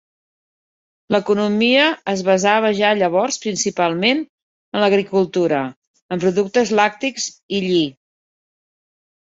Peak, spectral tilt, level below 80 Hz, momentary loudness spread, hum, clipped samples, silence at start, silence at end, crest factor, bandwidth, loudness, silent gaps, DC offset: -2 dBFS; -4 dB/octave; -62 dBFS; 8 LU; none; under 0.1%; 1.1 s; 1.45 s; 18 dB; 8 kHz; -18 LUFS; 4.29-4.72 s, 5.76-5.94 s, 6.02-6.09 s, 7.43-7.49 s; under 0.1%